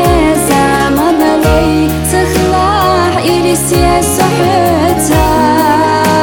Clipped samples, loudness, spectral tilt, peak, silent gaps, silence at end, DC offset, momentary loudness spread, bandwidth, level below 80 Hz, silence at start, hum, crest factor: under 0.1%; -9 LUFS; -5 dB/octave; 0 dBFS; none; 0 s; 0.7%; 2 LU; 19 kHz; -22 dBFS; 0 s; none; 10 dB